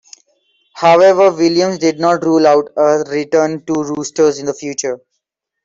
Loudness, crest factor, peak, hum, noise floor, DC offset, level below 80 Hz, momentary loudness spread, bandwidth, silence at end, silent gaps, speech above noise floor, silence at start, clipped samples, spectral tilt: -13 LUFS; 12 dB; -2 dBFS; none; -73 dBFS; under 0.1%; -60 dBFS; 12 LU; 7.8 kHz; 0.7 s; none; 61 dB; 0.75 s; under 0.1%; -4.5 dB/octave